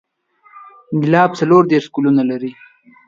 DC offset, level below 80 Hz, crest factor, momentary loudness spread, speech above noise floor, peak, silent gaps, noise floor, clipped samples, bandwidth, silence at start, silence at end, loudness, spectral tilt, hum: under 0.1%; -62 dBFS; 16 dB; 12 LU; 39 dB; 0 dBFS; none; -52 dBFS; under 0.1%; 7.6 kHz; 0.55 s; 0.55 s; -15 LUFS; -7.5 dB/octave; none